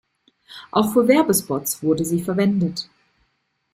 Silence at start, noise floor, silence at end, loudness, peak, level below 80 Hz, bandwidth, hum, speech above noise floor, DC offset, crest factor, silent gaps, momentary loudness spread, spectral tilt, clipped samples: 0.5 s; -70 dBFS; 0.9 s; -20 LUFS; -2 dBFS; -60 dBFS; 16 kHz; none; 51 dB; under 0.1%; 18 dB; none; 13 LU; -5 dB/octave; under 0.1%